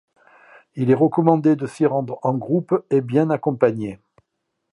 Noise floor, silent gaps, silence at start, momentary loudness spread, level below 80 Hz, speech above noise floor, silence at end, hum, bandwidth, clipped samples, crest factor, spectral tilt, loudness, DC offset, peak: -76 dBFS; none; 0.75 s; 8 LU; -64 dBFS; 57 dB; 0.8 s; none; 11 kHz; under 0.1%; 20 dB; -9.5 dB/octave; -20 LUFS; under 0.1%; 0 dBFS